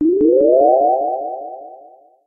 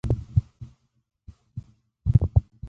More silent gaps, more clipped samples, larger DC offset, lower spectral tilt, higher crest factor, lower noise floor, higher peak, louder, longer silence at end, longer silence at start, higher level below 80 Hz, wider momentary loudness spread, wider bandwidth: neither; neither; neither; first, -13 dB/octave vs -11 dB/octave; second, 14 dB vs 22 dB; about the same, -45 dBFS vs -46 dBFS; about the same, -2 dBFS vs -4 dBFS; first, -14 LUFS vs -25 LUFS; first, 0.5 s vs 0 s; about the same, 0 s vs 0.05 s; second, -56 dBFS vs -34 dBFS; second, 19 LU vs 25 LU; second, 1.3 kHz vs 3.4 kHz